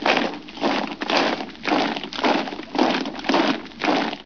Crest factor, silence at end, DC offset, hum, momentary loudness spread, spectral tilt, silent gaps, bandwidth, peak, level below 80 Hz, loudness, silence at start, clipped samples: 20 dB; 0 s; 0.4%; none; 5 LU; -4 dB/octave; none; 5.4 kHz; -4 dBFS; -58 dBFS; -22 LUFS; 0 s; under 0.1%